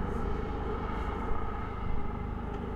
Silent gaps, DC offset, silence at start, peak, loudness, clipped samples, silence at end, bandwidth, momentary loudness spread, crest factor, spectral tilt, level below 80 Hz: none; under 0.1%; 0 s; -18 dBFS; -36 LUFS; under 0.1%; 0 s; 6.8 kHz; 2 LU; 14 dB; -8.5 dB/octave; -36 dBFS